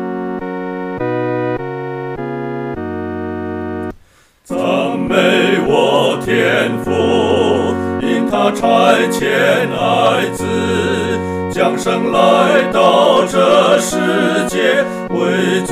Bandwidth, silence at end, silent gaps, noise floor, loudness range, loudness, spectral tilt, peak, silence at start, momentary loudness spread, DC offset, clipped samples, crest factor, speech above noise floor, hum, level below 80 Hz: 15.5 kHz; 0 s; none; -49 dBFS; 9 LU; -14 LUFS; -5 dB/octave; 0 dBFS; 0 s; 12 LU; 0.2%; under 0.1%; 14 dB; 36 dB; none; -46 dBFS